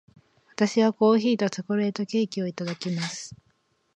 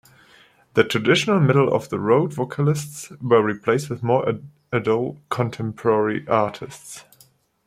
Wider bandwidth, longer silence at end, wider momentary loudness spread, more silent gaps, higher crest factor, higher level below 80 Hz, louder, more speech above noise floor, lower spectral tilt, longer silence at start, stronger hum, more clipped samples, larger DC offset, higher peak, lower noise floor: second, 9.4 kHz vs 15 kHz; about the same, 0.6 s vs 0.65 s; about the same, 12 LU vs 14 LU; neither; about the same, 18 dB vs 18 dB; second, -72 dBFS vs -62 dBFS; second, -25 LUFS vs -21 LUFS; first, 44 dB vs 36 dB; about the same, -5.5 dB/octave vs -6 dB/octave; second, 0.6 s vs 0.75 s; neither; neither; neither; second, -8 dBFS vs -2 dBFS; first, -69 dBFS vs -57 dBFS